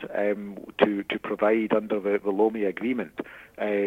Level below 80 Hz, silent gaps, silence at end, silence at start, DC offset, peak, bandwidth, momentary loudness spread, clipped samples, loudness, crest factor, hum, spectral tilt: -64 dBFS; none; 0 s; 0 s; under 0.1%; -4 dBFS; 4.8 kHz; 11 LU; under 0.1%; -26 LUFS; 22 dB; none; -7.5 dB/octave